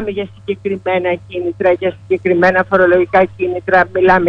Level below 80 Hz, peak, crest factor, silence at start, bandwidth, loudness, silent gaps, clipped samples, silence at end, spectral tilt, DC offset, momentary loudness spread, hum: -44 dBFS; 0 dBFS; 14 dB; 0 s; 6.2 kHz; -14 LUFS; none; under 0.1%; 0 s; -7.5 dB/octave; under 0.1%; 11 LU; none